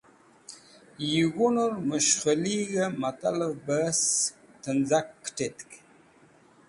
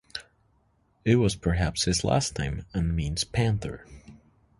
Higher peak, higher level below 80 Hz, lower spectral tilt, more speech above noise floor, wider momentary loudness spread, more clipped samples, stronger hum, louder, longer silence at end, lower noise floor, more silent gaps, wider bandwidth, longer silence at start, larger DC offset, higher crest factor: about the same, -10 dBFS vs -8 dBFS; second, -68 dBFS vs -40 dBFS; second, -3.5 dB/octave vs -5 dB/octave; second, 31 dB vs 41 dB; first, 17 LU vs 14 LU; neither; neither; about the same, -27 LUFS vs -26 LUFS; first, 0.9 s vs 0.45 s; second, -58 dBFS vs -67 dBFS; neither; about the same, 11.5 kHz vs 11.5 kHz; first, 0.5 s vs 0.15 s; neither; about the same, 20 dB vs 18 dB